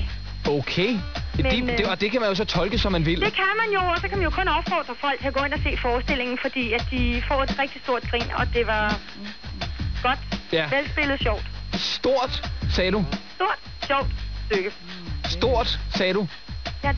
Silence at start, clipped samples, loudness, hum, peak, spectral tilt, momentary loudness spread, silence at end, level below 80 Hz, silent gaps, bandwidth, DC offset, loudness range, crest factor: 0 s; under 0.1%; -24 LUFS; none; -8 dBFS; -5.5 dB/octave; 8 LU; 0 s; -32 dBFS; none; 5.4 kHz; 0.8%; 3 LU; 16 dB